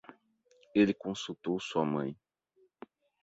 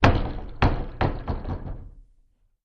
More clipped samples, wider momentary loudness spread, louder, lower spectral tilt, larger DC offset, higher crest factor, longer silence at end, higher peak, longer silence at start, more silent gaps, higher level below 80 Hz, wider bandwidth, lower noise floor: neither; about the same, 11 LU vs 12 LU; second, -33 LUFS vs -27 LUFS; about the same, -6 dB/octave vs -7 dB/octave; neither; about the same, 22 dB vs 24 dB; first, 1.1 s vs 0.65 s; second, -14 dBFS vs 0 dBFS; about the same, 0.1 s vs 0 s; neither; second, -70 dBFS vs -30 dBFS; first, 8 kHz vs 7.2 kHz; first, -71 dBFS vs -62 dBFS